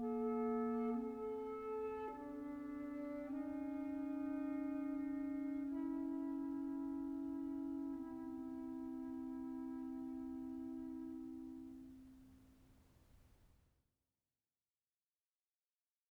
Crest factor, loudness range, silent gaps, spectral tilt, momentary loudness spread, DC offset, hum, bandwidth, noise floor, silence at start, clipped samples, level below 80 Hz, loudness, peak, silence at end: 14 dB; 10 LU; none; -8 dB/octave; 8 LU; under 0.1%; none; 5.2 kHz; under -90 dBFS; 0 s; under 0.1%; -72 dBFS; -45 LUFS; -32 dBFS; 2.7 s